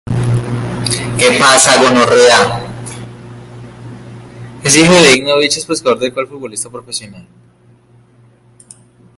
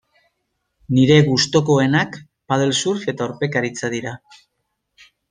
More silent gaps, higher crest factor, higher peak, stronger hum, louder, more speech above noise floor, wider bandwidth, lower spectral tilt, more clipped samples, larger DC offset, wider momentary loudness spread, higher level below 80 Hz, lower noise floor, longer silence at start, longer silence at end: neither; about the same, 14 dB vs 18 dB; about the same, 0 dBFS vs -2 dBFS; neither; first, -10 LUFS vs -18 LUFS; second, 37 dB vs 56 dB; first, 16 kHz vs 9.8 kHz; second, -3 dB/octave vs -5 dB/octave; first, 0.1% vs under 0.1%; neither; first, 25 LU vs 14 LU; first, -42 dBFS vs -56 dBFS; second, -47 dBFS vs -74 dBFS; second, 0.05 s vs 0.9 s; first, 1.95 s vs 1.15 s